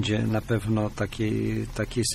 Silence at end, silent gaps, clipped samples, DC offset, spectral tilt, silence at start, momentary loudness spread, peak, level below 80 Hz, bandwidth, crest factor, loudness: 0 s; none; under 0.1%; under 0.1%; -5.5 dB/octave; 0 s; 4 LU; -12 dBFS; -42 dBFS; 14 kHz; 14 dB; -27 LUFS